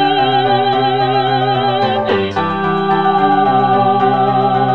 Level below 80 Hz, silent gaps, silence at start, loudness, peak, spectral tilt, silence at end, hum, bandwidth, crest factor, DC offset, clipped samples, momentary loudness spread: -50 dBFS; none; 0 s; -13 LUFS; 0 dBFS; -7.5 dB/octave; 0 s; none; 6 kHz; 12 dB; 1%; under 0.1%; 4 LU